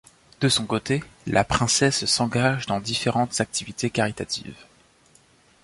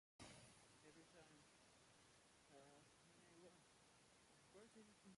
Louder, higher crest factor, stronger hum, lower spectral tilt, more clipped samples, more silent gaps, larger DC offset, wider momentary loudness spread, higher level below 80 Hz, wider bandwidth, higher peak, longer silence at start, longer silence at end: first, -23 LUFS vs -68 LUFS; about the same, 20 dB vs 22 dB; neither; about the same, -3.5 dB/octave vs -3.5 dB/octave; neither; neither; neither; first, 8 LU vs 5 LU; first, -48 dBFS vs -88 dBFS; about the same, 11.5 kHz vs 11.5 kHz; first, -4 dBFS vs -48 dBFS; first, 0.4 s vs 0.2 s; first, 1 s vs 0 s